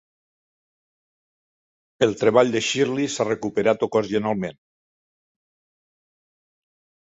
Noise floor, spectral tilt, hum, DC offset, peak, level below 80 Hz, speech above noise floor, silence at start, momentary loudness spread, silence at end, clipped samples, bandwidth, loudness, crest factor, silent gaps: under -90 dBFS; -4.5 dB/octave; none; under 0.1%; -2 dBFS; -64 dBFS; over 69 dB; 2 s; 7 LU; 2.65 s; under 0.1%; 8.2 kHz; -22 LUFS; 22 dB; none